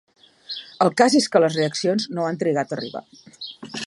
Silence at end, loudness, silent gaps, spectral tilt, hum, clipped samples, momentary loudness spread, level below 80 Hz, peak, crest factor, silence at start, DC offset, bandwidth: 0 s; -20 LUFS; none; -4.5 dB/octave; none; under 0.1%; 19 LU; -72 dBFS; -2 dBFS; 20 dB; 0.5 s; under 0.1%; 11.5 kHz